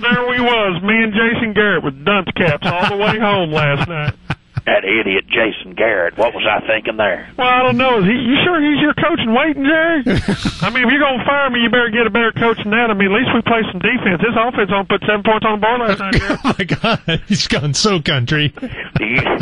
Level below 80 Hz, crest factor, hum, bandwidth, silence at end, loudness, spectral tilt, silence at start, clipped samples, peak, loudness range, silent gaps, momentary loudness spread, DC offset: -38 dBFS; 12 dB; none; 11.5 kHz; 0 s; -15 LUFS; -5 dB/octave; 0 s; under 0.1%; -2 dBFS; 2 LU; none; 5 LU; under 0.1%